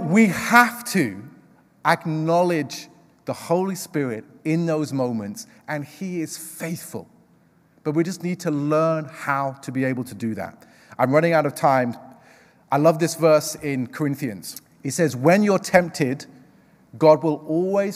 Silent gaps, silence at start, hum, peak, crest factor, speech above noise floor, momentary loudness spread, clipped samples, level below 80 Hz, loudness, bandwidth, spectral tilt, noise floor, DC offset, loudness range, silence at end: none; 0 s; none; 0 dBFS; 22 dB; 36 dB; 15 LU; under 0.1%; -66 dBFS; -22 LUFS; 16 kHz; -5.5 dB/octave; -58 dBFS; under 0.1%; 7 LU; 0 s